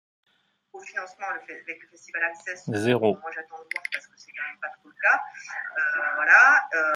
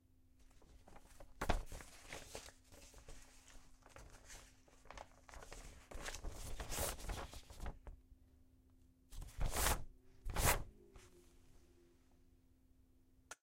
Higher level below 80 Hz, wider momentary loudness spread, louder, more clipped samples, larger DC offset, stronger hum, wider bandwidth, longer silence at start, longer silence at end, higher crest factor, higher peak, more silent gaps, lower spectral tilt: second, -76 dBFS vs -50 dBFS; second, 20 LU vs 26 LU; first, -23 LUFS vs -44 LUFS; neither; neither; neither; second, 12.5 kHz vs 16 kHz; first, 0.75 s vs 0.4 s; about the same, 0 s vs 0.1 s; second, 22 dB vs 28 dB; first, -4 dBFS vs -18 dBFS; neither; first, -4.5 dB/octave vs -3 dB/octave